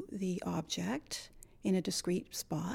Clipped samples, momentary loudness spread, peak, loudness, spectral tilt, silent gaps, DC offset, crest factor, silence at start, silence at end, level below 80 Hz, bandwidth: under 0.1%; 9 LU; -22 dBFS; -37 LUFS; -4.5 dB/octave; none; under 0.1%; 14 dB; 0 s; 0 s; -62 dBFS; 16.5 kHz